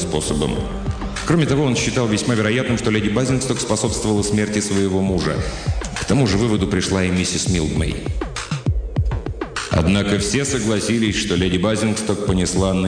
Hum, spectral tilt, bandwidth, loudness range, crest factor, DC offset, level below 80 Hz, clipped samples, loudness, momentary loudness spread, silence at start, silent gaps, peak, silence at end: none; -5 dB/octave; 10 kHz; 2 LU; 14 dB; under 0.1%; -30 dBFS; under 0.1%; -19 LUFS; 7 LU; 0 s; none; -6 dBFS; 0 s